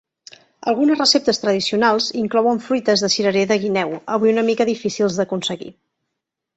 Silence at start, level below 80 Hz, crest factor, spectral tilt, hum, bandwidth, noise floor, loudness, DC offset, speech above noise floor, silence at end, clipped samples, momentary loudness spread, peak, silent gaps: 0.65 s; -62 dBFS; 16 dB; -4 dB/octave; none; 8.2 kHz; -80 dBFS; -18 LUFS; under 0.1%; 62 dB; 0.85 s; under 0.1%; 8 LU; -2 dBFS; none